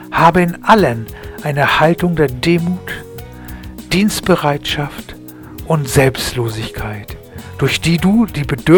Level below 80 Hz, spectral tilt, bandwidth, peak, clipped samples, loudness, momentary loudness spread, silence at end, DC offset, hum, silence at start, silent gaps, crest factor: -36 dBFS; -5.5 dB/octave; 19.5 kHz; 0 dBFS; under 0.1%; -15 LUFS; 20 LU; 0 s; under 0.1%; none; 0 s; none; 14 dB